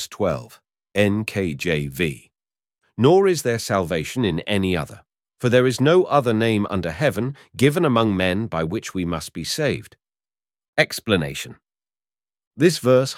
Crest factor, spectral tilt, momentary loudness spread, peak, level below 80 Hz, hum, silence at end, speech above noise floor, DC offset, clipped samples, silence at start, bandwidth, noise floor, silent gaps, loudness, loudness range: 20 dB; -5.5 dB/octave; 11 LU; -2 dBFS; -50 dBFS; none; 0 s; over 70 dB; under 0.1%; under 0.1%; 0 s; 16.5 kHz; under -90 dBFS; 10.68-10.73 s, 12.47-12.51 s; -21 LUFS; 5 LU